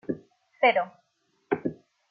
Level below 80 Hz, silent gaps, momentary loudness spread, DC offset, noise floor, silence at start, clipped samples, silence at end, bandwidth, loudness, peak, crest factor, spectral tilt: -70 dBFS; none; 14 LU; under 0.1%; -72 dBFS; 0.1 s; under 0.1%; 0.35 s; 5.6 kHz; -27 LUFS; -8 dBFS; 22 dB; -7 dB/octave